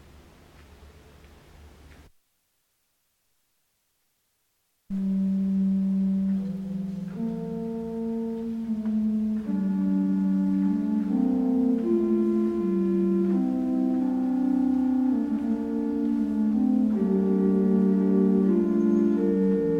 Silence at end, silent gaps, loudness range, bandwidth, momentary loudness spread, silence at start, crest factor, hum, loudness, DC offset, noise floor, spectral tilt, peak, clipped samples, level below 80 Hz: 0 s; none; 7 LU; 4.8 kHz; 9 LU; 0.8 s; 14 dB; none; -25 LUFS; under 0.1%; -73 dBFS; -10.5 dB/octave; -12 dBFS; under 0.1%; -56 dBFS